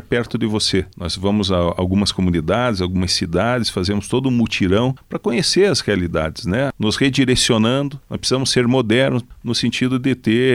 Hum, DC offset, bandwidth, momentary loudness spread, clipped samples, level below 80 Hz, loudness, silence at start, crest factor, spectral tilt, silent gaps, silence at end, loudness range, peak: none; under 0.1%; 15.5 kHz; 7 LU; under 0.1%; -40 dBFS; -18 LUFS; 0.1 s; 16 dB; -5 dB/octave; none; 0 s; 1 LU; -2 dBFS